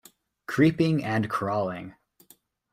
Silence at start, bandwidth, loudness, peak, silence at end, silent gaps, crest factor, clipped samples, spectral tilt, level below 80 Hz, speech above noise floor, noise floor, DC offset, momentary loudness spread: 0.5 s; 15.5 kHz; -25 LUFS; -8 dBFS; 0.8 s; none; 20 dB; under 0.1%; -7.5 dB/octave; -62 dBFS; 36 dB; -60 dBFS; under 0.1%; 19 LU